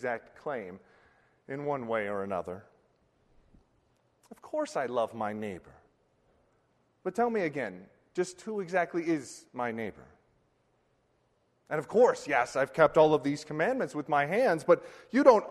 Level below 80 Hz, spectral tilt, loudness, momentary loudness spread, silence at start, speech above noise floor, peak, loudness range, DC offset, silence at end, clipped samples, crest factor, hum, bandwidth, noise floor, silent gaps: -70 dBFS; -5.5 dB/octave; -30 LUFS; 15 LU; 0 s; 43 dB; -8 dBFS; 11 LU; under 0.1%; 0 s; under 0.1%; 24 dB; none; 12.5 kHz; -72 dBFS; none